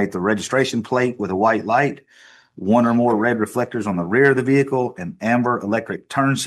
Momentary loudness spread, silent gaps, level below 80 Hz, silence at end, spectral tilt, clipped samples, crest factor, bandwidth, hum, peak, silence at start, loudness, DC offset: 8 LU; none; -62 dBFS; 0 s; -6 dB/octave; under 0.1%; 16 dB; 13 kHz; none; -2 dBFS; 0 s; -19 LUFS; under 0.1%